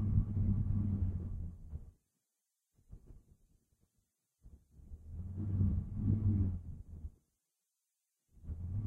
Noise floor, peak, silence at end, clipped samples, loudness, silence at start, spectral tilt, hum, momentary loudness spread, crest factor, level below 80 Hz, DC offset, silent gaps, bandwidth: -87 dBFS; -18 dBFS; 0 s; under 0.1%; -37 LUFS; 0 s; -12 dB/octave; none; 18 LU; 20 dB; -46 dBFS; under 0.1%; none; 1.7 kHz